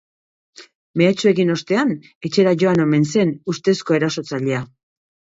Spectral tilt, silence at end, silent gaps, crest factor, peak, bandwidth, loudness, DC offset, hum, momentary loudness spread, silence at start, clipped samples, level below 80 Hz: -6 dB/octave; 0.65 s; 0.75-0.94 s, 2.15-2.21 s; 16 dB; -2 dBFS; 7.8 kHz; -18 LUFS; under 0.1%; none; 8 LU; 0.6 s; under 0.1%; -62 dBFS